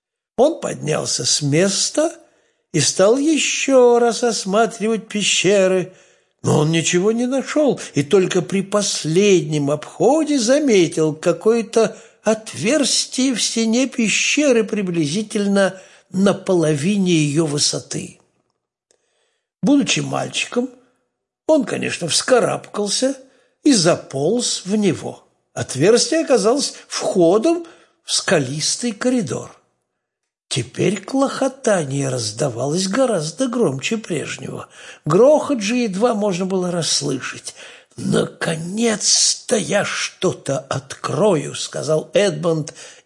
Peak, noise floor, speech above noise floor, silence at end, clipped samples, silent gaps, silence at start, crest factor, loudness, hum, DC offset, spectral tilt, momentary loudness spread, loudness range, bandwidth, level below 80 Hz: -2 dBFS; -80 dBFS; 62 dB; 0.15 s; under 0.1%; none; 0.4 s; 16 dB; -18 LUFS; none; under 0.1%; -4 dB/octave; 10 LU; 5 LU; 11.5 kHz; -64 dBFS